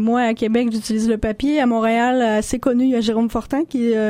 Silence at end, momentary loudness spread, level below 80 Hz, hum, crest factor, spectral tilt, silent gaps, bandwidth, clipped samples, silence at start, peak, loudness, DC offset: 0 s; 4 LU; -42 dBFS; none; 14 dB; -5 dB/octave; none; 15 kHz; under 0.1%; 0 s; -4 dBFS; -18 LUFS; under 0.1%